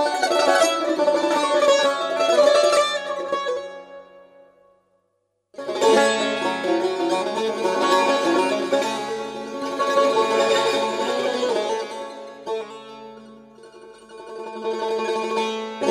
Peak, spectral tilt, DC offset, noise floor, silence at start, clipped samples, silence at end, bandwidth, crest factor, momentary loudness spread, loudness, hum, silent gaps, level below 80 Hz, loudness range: -4 dBFS; -2.5 dB/octave; under 0.1%; -71 dBFS; 0 s; under 0.1%; 0 s; 15.5 kHz; 18 dB; 17 LU; -21 LUFS; none; none; -70 dBFS; 10 LU